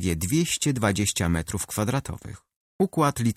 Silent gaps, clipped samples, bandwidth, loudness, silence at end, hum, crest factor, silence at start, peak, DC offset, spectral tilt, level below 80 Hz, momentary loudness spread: 2.56-2.79 s; under 0.1%; 16 kHz; -25 LUFS; 0.05 s; none; 16 dB; 0 s; -8 dBFS; under 0.1%; -4.5 dB/octave; -44 dBFS; 9 LU